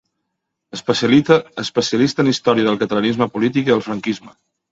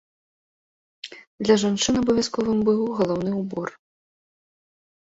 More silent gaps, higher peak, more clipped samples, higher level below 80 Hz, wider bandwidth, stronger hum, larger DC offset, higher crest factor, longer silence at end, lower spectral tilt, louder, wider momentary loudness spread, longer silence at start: second, none vs 1.27-1.38 s; first, 0 dBFS vs -6 dBFS; neither; about the same, -58 dBFS vs -56 dBFS; about the same, 8 kHz vs 8 kHz; neither; neither; about the same, 18 dB vs 20 dB; second, 0.4 s vs 1.35 s; about the same, -5.5 dB/octave vs -5 dB/octave; first, -17 LUFS vs -22 LUFS; second, 10 LU vs 20 LU; second, 0.75 s vs 1.05 s